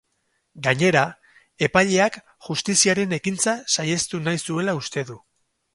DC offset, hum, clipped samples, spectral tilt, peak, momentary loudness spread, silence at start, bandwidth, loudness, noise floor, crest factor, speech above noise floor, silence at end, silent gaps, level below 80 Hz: under 0.1%; none; under 0.1%; -3.5 dB/octave; -2 dBFS; 10 LU; 0.55 s; 11.5 kHz; -21 LUFS; -71 dBFS; 22 dB; 50 dB; 0.6 s; none; -58 dBFS